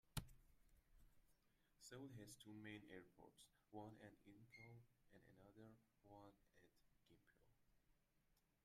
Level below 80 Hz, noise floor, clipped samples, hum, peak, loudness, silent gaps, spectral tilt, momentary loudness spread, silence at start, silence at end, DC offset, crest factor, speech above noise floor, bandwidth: -74 dBFS; -84 dBFS; under 0.1%; none; -32 dBFS; -62 LUFS; none; -4.5 dB/octave; 10 LU; 0.05 s; 0.2 s; under 0.1%; 32 dB; 21 dB; 15 kHz